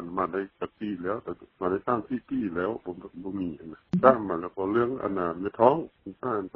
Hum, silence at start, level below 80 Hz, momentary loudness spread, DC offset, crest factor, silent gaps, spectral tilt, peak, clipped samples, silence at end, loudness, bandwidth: none; 0 s; -62 dBFS; 15 LU; under 0.1%; 24 dB; none; -7 dB/octave; -4 dBFS; under 0.1%; 0.1 s; -28 LUFS; 5.6 kHz